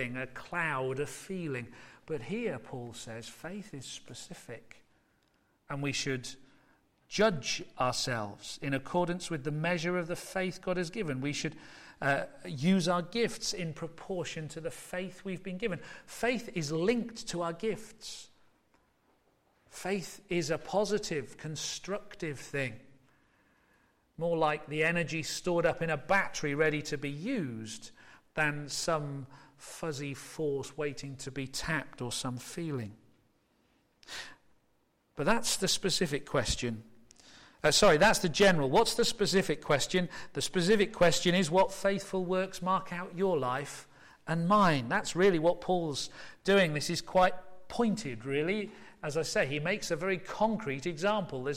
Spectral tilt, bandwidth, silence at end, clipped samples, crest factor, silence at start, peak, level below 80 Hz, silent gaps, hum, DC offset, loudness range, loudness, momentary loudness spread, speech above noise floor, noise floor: -4 dB/octave; 16 kHz; 0 s; under 0.1%; 18 dB; 0 s; -14 dBFS; -56 dBFS; none; none; under 0.1%; 12 LU; -32 LUFS; 16 LU; 41 dB; -73 dBFS